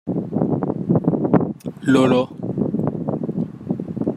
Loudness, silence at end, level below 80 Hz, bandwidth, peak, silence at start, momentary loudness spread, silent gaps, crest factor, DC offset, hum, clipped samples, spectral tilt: -21 LUFS; 0 s; -54 dBFS; 11.5 kHz; -2 dBFS; 0.05 s; 10 LU; none; 18 dB; under 0.1%; none; under 0.1%; -8 dB/octave